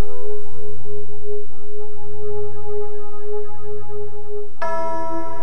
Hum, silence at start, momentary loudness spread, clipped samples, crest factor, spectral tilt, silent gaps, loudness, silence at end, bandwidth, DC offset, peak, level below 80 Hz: none; 0 s; 10 LU; under 0.1%; 10 dB; -8.5 dB/octave; none; -31 LUFS; 0 s; 8.8 kHz; 40%; -4 dBFS; -52 dBFS